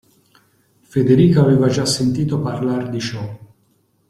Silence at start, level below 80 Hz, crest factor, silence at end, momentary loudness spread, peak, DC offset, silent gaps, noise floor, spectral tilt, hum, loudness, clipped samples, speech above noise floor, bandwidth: 0.95 s; -50 dBFS; 16 dB; 0.7 s; 13 LU; -2 dBFS; under 0.1%; none; -61 dBFS; -6.5 dB/octave; none; -17 LUFS; under 0.1%; 45 dB; 14 kHz